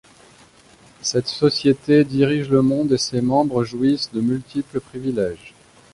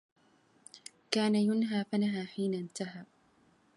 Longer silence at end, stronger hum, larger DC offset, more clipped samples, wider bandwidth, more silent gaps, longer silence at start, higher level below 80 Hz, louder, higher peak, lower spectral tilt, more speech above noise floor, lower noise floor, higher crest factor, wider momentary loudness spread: second, 0.45 s vs 0.75 s; neither; neither; neither; about the same, 11.5 kHz vs 11.5 kHz; neither; first, 1.05 s vs 0.75 s; first, -54 dBFS vs -82 dBFS; first, -20 LUFS vs -32 LUFS; first, -4 dBFS vs -10 dBFS; about the same, -5.5 dB/octave vs -5.5 dB/octave; second, 31 dB vs 36 dB; second, -50 dBFS vs -67 dBFS; second, 16 dB vs 24 dB; second, 10 LU vs 22 LU